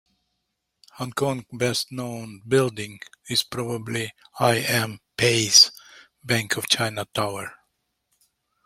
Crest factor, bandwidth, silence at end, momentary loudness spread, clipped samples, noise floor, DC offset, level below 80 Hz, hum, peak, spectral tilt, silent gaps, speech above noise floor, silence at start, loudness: 24 dB; 16.5 kHz; 1.1 s; 19 LU; under 0.1%; -78 dBFS; under 0.1%; -62 dBFS; none; -2 dBFS; -2.5 dB/octave; none; 54 dB; 0.95 s; -22 LUFS